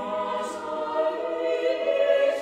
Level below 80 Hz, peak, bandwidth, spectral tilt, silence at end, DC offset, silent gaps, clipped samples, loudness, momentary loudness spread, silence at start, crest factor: -70 dBFS; -10 dBFS; 10.5 kHz; -3.5 dB/octave; 0 s; under 0.1%; none; under 0.1%; -26 LUFS; 9 LU; 0 s; 14 dB